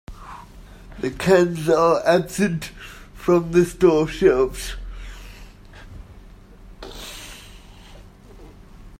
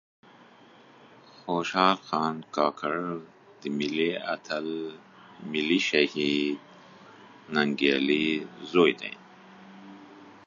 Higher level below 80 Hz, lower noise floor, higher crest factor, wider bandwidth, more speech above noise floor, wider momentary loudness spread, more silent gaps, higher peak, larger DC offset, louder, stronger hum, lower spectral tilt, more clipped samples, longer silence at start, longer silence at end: first, -40 dBFS vs -72 dBFS; second, -44 dBFS vs -54 dBFS; about the same, 20 dB vs 24 dB; first, 16 kHz vs 7.4 kHz; about the same, 25 dB vs 27 dB; first, 24 LU vs 18 LU; neither; first, -2 dBFS vs -6 dBFS; neither; first, -19 LUFS vs -27 LUFS; neither; about the same, -6 dB/octave vs -5 dB/octave; neither; second, 0.1 s vs 1.45 s; about the same, 0.05 s vs 0.1 s